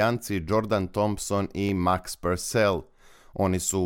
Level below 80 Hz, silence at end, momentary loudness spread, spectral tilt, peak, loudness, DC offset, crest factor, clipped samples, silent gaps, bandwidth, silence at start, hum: -50 dBFS; 0 s; 5 LU; -5 dB/octave; -8 dBFS; -26 LUFS; under 0.1%; 18 dB; under 0.1%; none; 17.5 kHz; 0 s; none